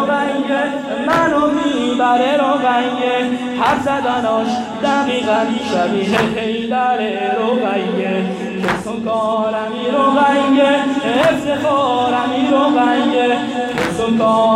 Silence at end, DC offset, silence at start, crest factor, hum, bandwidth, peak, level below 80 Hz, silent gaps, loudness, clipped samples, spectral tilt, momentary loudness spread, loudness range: 0 s; under 0.1%; 0 s; 12 dB; none; 13.5 kHz; -4 dBFS; -50 dBFS; none; -16 LUFS; under 0.1%; -5 dB/octave; 6 LU; 3 LU